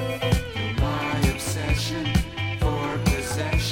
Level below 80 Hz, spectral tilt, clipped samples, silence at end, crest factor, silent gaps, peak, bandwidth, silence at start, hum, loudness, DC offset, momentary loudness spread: -30 dBFS; -5 dB/octave; under 0.1%; 0 s; 18 dB; none; -6 dBFS; 17 kHz; 0 s; none; -25 LUFS; under 0.1%; 2 LU